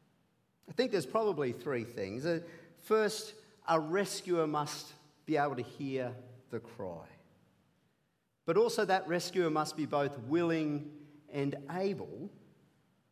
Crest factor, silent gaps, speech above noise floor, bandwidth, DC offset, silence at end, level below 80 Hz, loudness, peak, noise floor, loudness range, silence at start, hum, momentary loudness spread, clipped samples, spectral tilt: 20 dB; none; 44 dB; 15.5 kHz; under 0.1%; 0.8 s; -76 dBFS; -34 LUFS; -16 dBFS; -78 dBFS; 6 LU; 0.65 s; none; 14 LU; under 0.1%; -5 dB/octave